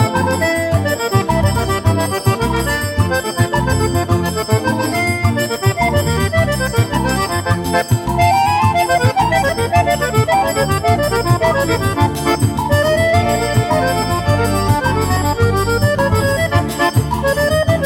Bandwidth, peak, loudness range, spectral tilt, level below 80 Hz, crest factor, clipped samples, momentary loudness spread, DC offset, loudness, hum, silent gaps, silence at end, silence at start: 17.5 kHz; 0 dBFS; 2 LU; -5.5 dB/octave; -30 dBFS; 14 dB; under 0.1%; 3 LU; under 0.1%; -15 LUFS; none; none; 0 s; 0 s